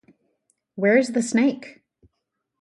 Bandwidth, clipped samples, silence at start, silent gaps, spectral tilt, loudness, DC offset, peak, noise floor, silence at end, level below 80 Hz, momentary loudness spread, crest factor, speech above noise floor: 11.5 kHz; under 0.1%; 0.75 s; none; -5 dB/octave; -21 LUFS; under 0.1%; -4 dBFS; -79 dBFS; 0.9 s; -70 dBFS; 22 LU; 20 dB; 59 dB